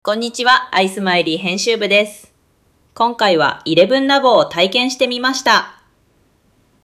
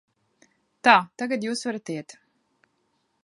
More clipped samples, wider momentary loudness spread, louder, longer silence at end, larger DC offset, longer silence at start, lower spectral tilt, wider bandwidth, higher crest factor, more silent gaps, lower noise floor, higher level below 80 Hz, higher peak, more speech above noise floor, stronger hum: neither; second, 6 LU vs 16 LU; first, -14 LUFS vs -23 LUFS; about the same, 1.15 s vs 1.2 s; neither; second, 0.05 s vs 0.85 s; about the same, -3.5 dB/octave vs -3.5 dB/octave; first, 15 kHz vs 11.5 kHz; second, 16 dB vs 26 dB; neither; second, -57 dBFS vs -72 dBFS; first, -60 dBFS vs -80 dBFS; about the same, 0 dBFS vs -2 dBFS; second, 43 dB vs 49 dB; neither